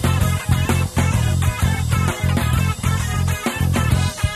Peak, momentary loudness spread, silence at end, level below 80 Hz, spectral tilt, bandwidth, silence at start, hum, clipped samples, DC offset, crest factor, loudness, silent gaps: -4 dBFS; 2 LU; 0 s; -28 dBFS; -5 dB/octave; 15 kHz; 0 s; none; under 0.1%; under 0.1%; 14 dB; -19 LUFS; none